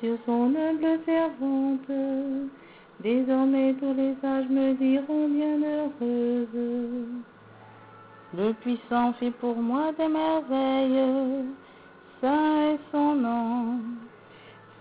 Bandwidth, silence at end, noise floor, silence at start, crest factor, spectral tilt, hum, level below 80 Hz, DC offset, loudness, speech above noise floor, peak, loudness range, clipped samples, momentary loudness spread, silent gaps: 4 kHz; 0.2 s; -51 dBFS; 0 s; 14 dB; -4.5 dB/octave; none; -70 dBFS; under 0.1%; -26 LUFS; 25 dB; -12 dBFS; 5 LU; under 0.1%; 9 LU; none